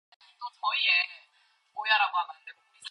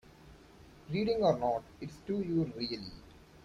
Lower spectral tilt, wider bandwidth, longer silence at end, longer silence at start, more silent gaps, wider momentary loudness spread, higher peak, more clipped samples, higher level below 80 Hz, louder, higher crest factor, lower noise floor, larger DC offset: second, 3.5 dB/octave vs -7 dB/octave; second, 11 kHz vs 13.5 kHz; about the same, 0 s vs 0.05 s; first, 0.4 s vs 0.25 s; neither; first, 20 LU vs 17 LU; first, -12 dBFS vs -16 dBFS; neither; second, under -90 dBFS vs -60 dBFS; first, -26 LUFS vs -34 LUFS; about the same, 20 dB vs 20 dB; first, -67 dBFS vs -57 dBFS; neither